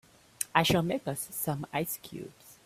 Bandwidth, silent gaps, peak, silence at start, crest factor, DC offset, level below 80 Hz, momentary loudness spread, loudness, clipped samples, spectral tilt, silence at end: 16 kHz; none; -6 dBFS; 0.4 s; 26 dB; under 0.1%; -60 dBFS; 18 LU; -31 LUFS; under 0.1%; -4 dB/octave; 0.1 s